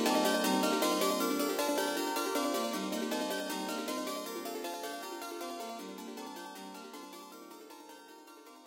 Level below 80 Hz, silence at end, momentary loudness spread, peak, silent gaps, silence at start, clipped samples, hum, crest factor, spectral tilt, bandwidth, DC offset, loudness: -86 dBFS; 0 s; 21 LU; -18 dBFS; none; 0 s; under 0.1%; none; 18 dB; -3 dB/octave; 17 kHz; under 0.1%; -34 LUFS